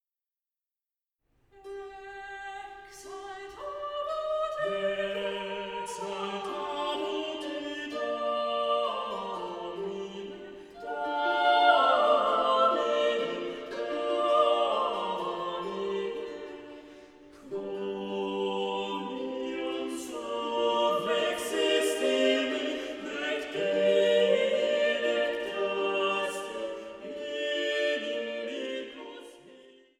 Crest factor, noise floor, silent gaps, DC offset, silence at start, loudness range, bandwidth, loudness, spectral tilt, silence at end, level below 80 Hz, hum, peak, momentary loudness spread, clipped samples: 20 dB; under -90 dBFS; none; under 0.1%; 1.55 s; 10 LU; 15 kHz; -29 LUFS; -3 dB/octave; 0.3 s; -68 dBFS; none; -10 dBFS; 17 LU; under 0.1%